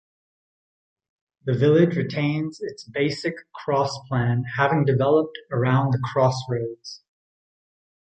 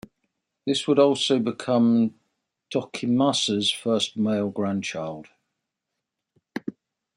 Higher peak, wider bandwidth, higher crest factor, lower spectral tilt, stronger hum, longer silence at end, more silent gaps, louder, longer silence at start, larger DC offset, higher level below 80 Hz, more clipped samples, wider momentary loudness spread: about the same, -4 dBFS vs -6 dBFS; second, 8.8 kHz vs 11.5 kHz; about the same, 20 dB vs 20 dB; first, -7 dB/octave vs -4.5 dB/octave; neither; first, 1.1 s vs 0.45 s; neither; about the same, -23 LUFS vs -23 LUFS; first, 1.45 s vs 0.65 s; neither; first, -58 dBFS vs -70 dBFS; neither; about the same, 14 LU vs 16 LU